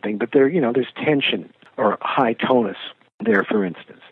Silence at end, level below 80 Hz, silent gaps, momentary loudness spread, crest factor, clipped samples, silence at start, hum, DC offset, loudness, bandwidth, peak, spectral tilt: 0.2 s; -72 dBFS; 3.14-3.19 s; 12 LU; 18 dB; under 0.1%; 0.05 s; none; under 0.1%; -20 LUFS; 4.3 kHz; -2 dBFS; -8.5 dB/octave